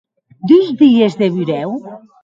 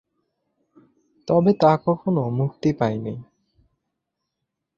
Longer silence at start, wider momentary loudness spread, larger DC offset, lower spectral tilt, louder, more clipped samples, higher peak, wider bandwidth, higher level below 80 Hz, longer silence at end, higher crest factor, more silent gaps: second, 0.45 s vs 1.25 s; about the same, 15 LU vs 16 LU; neither; about the same, -8 dB/octave vs -9 dB/octave; first, -13 LUFS vs -21 LUFS; neither; first, 0 dBFS vs -4 dBFS; about the same, 7.6 kHz vs 7.2 kHz; about the same, -62 dBFS vs -58 dBFS; second, 0.25 s vs 1.55 s; second, 14 dB vs 20 dB; neither